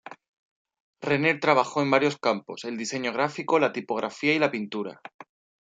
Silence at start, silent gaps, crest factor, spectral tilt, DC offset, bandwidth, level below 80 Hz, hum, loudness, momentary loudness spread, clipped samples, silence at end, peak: 0.05 s; 0.28-0.65 s, 0.80-0.93 s, 5.14-5.19 s; 22 dB; -5 dB/octave; under 0.1%; 9.2 kHz; -72 dBFS; none; -25 LUFS; 12 LU; under 0.1%; 0.4 s; -6 dBFS